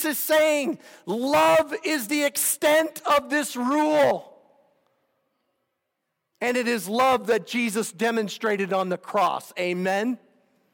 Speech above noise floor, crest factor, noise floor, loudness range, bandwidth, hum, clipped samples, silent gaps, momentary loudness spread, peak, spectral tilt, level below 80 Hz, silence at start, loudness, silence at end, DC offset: 56 dB; 14 dB; -79 dBFS; 5 LU; over 20 kHz; none; under 0.1%; none; 8 LU; -10 dBFS; -3 dB/octave; -70 dBFS; 0 s; -23 LUFS; 0.55 s; under 0.1%